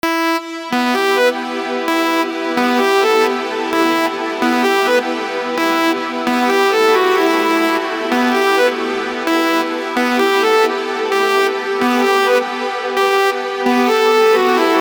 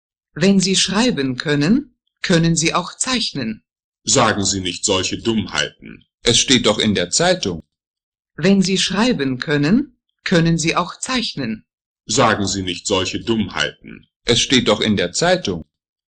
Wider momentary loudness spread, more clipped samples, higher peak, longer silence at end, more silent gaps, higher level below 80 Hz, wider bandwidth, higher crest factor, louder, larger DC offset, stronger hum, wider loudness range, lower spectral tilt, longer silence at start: second, 6 LU vs 11 LU; neither; about the same, -2 dBFS vs 0 dBFS; second, 0 s vs 0.45 s; second, none vs 3.84-3.92 s, 6.14-6.18 s, 7.87-7.94 s, 8.03-8.12 s, 11.81-11.95 s, 14.16-14.20 s; second, -62 dBFS vs -44 dBFS; first, over 20 kHz vs 9.8 kHz; about the same, 14 dB vs 18 dB; about the same, -15 LUFS vs -17 LUFS; neither; neither; about the same, 1 LU vs 3 LU; about the same, -2.5 dB/octave vs -3.5 dB/octave; second, 0.05 s vs 0.35 s